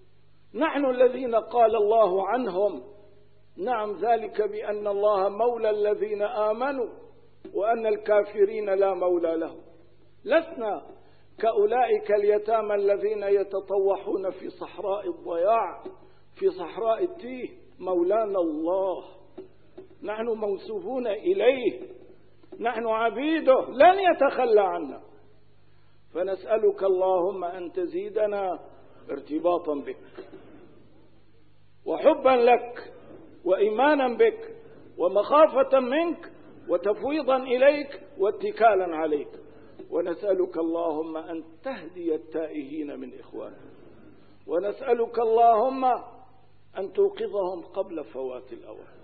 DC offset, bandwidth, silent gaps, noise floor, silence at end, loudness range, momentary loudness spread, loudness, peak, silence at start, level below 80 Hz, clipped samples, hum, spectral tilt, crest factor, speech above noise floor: 0.3%; 4.7 kHz; none; -61 dBFS; 0.2 s; 7 LU; 17 LU; -25 LUFS; -6 dBFS; 0.55 s; -66 dBFS; under 0.1%; 50 Hz at -65 dBFS; -9 dB/octave; 20 dB; 37 dB